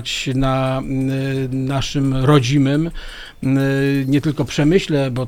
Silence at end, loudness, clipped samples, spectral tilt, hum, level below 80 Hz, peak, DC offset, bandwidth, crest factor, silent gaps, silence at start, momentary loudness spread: 0 s; -18 LUFS; under 0.1%; -6.5 dB/octave; none; -34 dBFS; -2 dBFS; under 0.1%; 15 kHz; 16 dB; none; 0 s; 7 LU